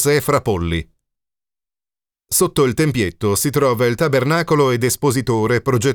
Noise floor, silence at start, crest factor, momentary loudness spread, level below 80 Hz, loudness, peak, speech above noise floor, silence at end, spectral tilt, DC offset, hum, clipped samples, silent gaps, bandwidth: under -90 dBFS; 0 s; 16 dB; 4 LU; -44 dBFS; -17 LUFS; -2 dBFS; over 74 dB; 0 s; -5 dB/octave; under 0.1%; none; under 0.1%; none; over 20 kHz